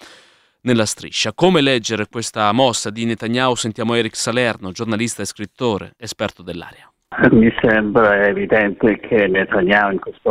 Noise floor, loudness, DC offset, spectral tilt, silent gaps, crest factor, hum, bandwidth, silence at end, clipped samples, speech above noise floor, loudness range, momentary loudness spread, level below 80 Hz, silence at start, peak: -51 dBFS; -17 LUFS; under 0.1%; -4.5 dB/octave; none; 16 dB; none; 15 kHz; 0 s; under 0.1%; 34 dB; 6 LU; 12 LU; -46 dBFS; 0.05 s; 0 dBFS